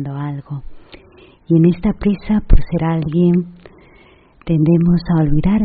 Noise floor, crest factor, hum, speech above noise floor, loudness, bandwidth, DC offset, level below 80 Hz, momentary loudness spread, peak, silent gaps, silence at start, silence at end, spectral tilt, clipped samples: -47 dBFS; 14 dB; none; 33 dB; -16 LUFS; 4.8 kHz; under 0.1%; -22 dBFS; 15 LU; 0 dBFS; none; 0 s; 0 s; -9.5 dB/octave; under 0.1%